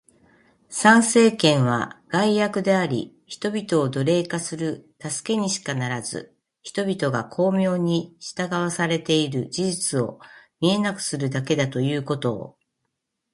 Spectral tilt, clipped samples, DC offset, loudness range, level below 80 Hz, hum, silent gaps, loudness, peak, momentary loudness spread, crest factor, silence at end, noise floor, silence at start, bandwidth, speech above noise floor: -4.5 dB/octave; under 0.1%; under 0.1%; 6 LU; -64 dBFS; none; none; -22 LUFS; 0 dBFS; 13 LU; 22 dB; 0.85 s; -78 dBFS; 0.7 s; 11.5 kHz; 56 dB